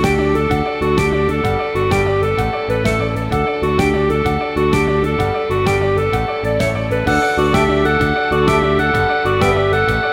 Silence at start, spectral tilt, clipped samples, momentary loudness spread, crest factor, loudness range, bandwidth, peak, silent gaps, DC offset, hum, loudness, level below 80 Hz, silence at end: 0 s; -6.5 dB/octave; under 0.1%; 4 LU; 14 dB; 2 LU; 16.5 kHz; -2 dBFS; none; under 0.1%; none; -16 LUFS; -30 dBFS; 0 s